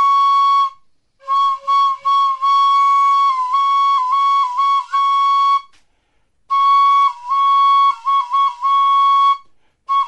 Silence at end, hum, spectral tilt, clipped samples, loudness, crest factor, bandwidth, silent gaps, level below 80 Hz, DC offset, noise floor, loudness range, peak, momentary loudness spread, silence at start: 0 s; none; 2.5 dB/octave; under 0.1%; -14 LUFS; 8 dB; 8.4 kHz; none; -66 dBFS; under 0.1%; -63 dBFS; 2 LU; -6 dBFS; 5 LU; 0 s